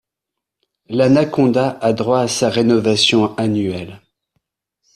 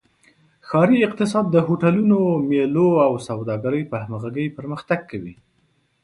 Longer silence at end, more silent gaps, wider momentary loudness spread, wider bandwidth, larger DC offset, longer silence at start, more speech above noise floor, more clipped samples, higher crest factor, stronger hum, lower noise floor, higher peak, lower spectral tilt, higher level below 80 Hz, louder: first, 1 s vs 0.7 s; neither; about the same, 10 LU vs 11 LU; first, 13 kHz vs 11.5 kHz; neither; first, 0.9 s vs 0.65 s; first, 67 dB vs 45 dB; neither; about the same, 16 dB vs 16 dB; neither; first, -82 dBFS vs -64 dBFS; about the same, -2 dBFS vs -4 dBFS; second, -5 dB/octave vs -8 dB/octave; first, -54 dBFS vs -60 dBFS; first, -16 LUFS vs -20 LUFS